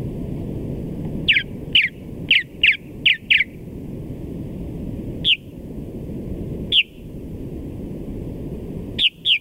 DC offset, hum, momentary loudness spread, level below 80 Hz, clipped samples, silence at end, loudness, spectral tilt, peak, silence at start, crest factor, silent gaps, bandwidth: under 0.1%; none; 17 LU; -38 dBFS; under 0.1%; 0 s; -19 LUFS; -5 dB/octave; -4 dBFS; 0 s; 20 dB; none; 16 kHz